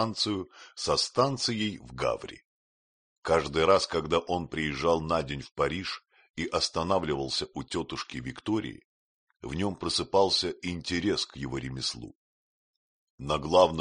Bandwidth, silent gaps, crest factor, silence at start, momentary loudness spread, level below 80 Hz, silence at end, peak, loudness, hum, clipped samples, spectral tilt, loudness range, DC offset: 10 kHz; 2.45-3.22 s, 6.30-6.34 s, 8.85-9.27 s, 12.15-13.18 s; 24 dB; 0 s; 13 LU; -52 dBFS; 0 s; -6 dBFS; -29 LUFS; none; under 0.1%; -4 dB/octave; 4 LU; under 0.1%